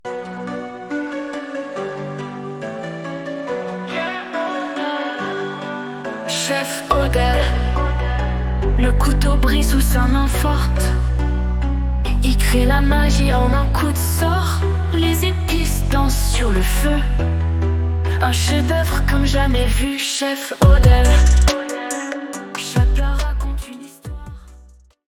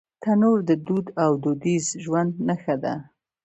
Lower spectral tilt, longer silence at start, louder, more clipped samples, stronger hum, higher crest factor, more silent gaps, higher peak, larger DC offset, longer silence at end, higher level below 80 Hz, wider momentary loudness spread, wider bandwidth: second, -5 dB/octave vs -6.5 dB/octave; second, 0.05 s vs 0.2 s; first, -19 LUFS vs -23 LUFS; neither; neither; about the same, 16 dB vs 16 dB; neither; first, 0 dBFS vs -8 dBFS; neither; about the same, 0.45 s vs 0.4 s; first, -20 dBFS vs -66 dBFS; first, 12 LU vs 7 LU; first, 18 kHz vs 8.2 kHz